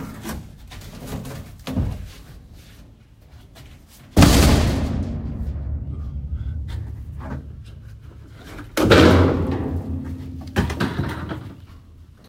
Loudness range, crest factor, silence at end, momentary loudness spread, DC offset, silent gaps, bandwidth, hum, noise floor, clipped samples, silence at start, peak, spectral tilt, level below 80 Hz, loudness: 13 LU; 22 dB; 0.25 s; 26 LU; under 0.1%; none; 16 kHz; none; -47 dBFS; under 0.1%; 0 s; 0 dBFS; -5.5 dB/octave; -30 dBFS; -21 LUFS